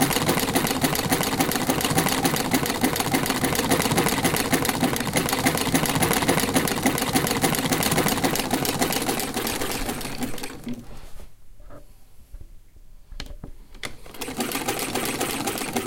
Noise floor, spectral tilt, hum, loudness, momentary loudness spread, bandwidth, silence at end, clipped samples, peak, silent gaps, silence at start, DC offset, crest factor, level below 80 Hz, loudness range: -44 dBFS; -3.5 dB/octave; none; -23 LUFS; 13 LU; 17.5 kHz; 0 s; under 0.1%; -4 dBFS; none; 0 s; under 0.1%; 20 dB; -42 dBFS; 16 LU